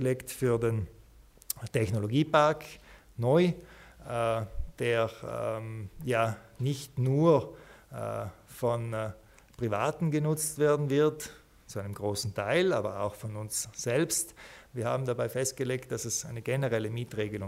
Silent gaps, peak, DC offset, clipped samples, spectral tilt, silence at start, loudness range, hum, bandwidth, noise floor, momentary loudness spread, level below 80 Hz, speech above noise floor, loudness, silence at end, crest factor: none; -10 dBFS; under 0.1%; under 0.1%; -5.5 dB/octave; 0 s; 3 LU; none; 16 kHz; -56 dBFS; 14 LU; -52 dBFS; 26 dB; -30 LUFS; 0 s; 22 dB